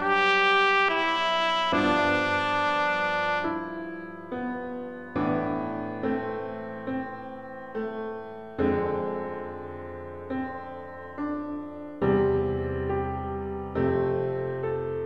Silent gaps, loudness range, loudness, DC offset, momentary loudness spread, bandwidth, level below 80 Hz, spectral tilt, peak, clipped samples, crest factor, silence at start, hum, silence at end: none; 8 LU; -27 LUFS; under 0.1%; 16 LU; 9.4 kHz; -50 dBFS; -6 dB/octave; -10 dBFS; under 0.1%; 18 dB; 0 s; none; 0 s